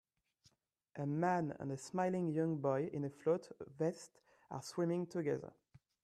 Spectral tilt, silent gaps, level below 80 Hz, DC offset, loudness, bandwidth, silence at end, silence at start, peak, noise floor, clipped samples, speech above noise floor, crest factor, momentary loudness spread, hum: -7 dB/octave; none; -80 dBFS; under 0.1%; -39 LUFS; 13.5 kHz; 0.55 s; 0.95 s; -22 dBFS; -75 dBFS; under 0.1%; 36 dB; 18 dB; 15 LU; none